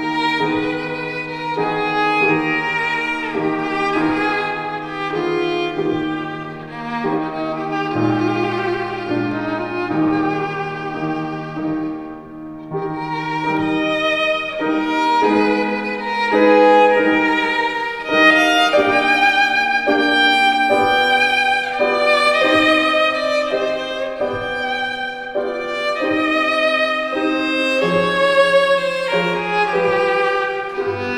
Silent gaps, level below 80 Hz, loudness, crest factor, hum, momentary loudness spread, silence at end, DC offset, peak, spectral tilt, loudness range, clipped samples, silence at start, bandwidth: none; -52 dBFS; -17 LUFS; 18 dB; none; 11 LU; 0 s; under 0.1%; 0 dBFS; -5 dB/octave; 8 LU; under 0.1%; 0 s; 13 kHz